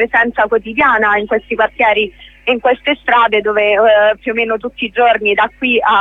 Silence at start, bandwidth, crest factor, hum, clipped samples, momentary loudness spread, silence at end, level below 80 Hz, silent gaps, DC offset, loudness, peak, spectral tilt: 0 s; 4.1 kHz; 12 dB; 50 Hz at -45 dBFS; under 0.1%; 7 LU; 0 s; -46 dBFS; none; under 0.1%; -13 LUFS; -2 dBFS; -5.5 dB/octave